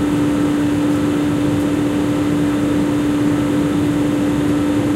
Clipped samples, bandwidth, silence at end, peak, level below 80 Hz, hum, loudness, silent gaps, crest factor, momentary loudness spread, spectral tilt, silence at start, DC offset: under 0.1%; 15 kHz; 0 s; -6 dBFS; -38 dBFS; none; -17 LUFS; none; 10 dB; 1 LU; -6.5 dB/octave; 0 s; under 0.1%